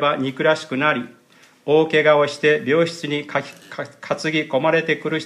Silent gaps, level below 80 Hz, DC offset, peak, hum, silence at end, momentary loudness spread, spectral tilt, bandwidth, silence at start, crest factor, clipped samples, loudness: none; -70 dBFS; under 0.1%; -2 dBFS; none; 0 s; 16 LU; -5 dB/octave; 11 kHz; 0 s; 18 dB; under 0.1%; -19 LUFS